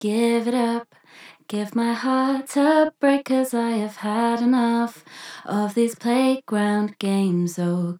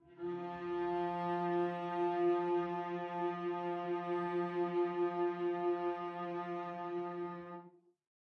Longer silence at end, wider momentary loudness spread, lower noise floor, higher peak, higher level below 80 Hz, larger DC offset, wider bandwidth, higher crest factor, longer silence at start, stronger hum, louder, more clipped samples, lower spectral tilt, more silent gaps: second, 0 s vs 0.55 s; about the same, 9 LU vs 8 LU; second, -48 dBFS vs -59 dBFS; first, -6 dBFS vs -24 dBFS; second, -86 dBFS vs -80 dBFS; neither; first, 16 kHz vs 5.8 kHz; about the same, 16 dB vs 14 dB; about the same, 0 s vs 0.05 s; neither; first, -22 LUFS vs -38 LUFS; neither; second, -6 dB/octave vs -8.5 dB/octave; neither